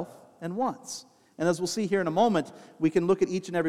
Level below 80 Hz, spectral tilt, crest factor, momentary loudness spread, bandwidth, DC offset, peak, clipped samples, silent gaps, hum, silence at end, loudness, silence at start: -68 dBFS; -5.5 dB/octave; 18 dB; 16 LU; 14.5 kHz; under 0.1%; -10 dBFS; under 0.1%; none; none; 0 s; -27 LUFS; 0 s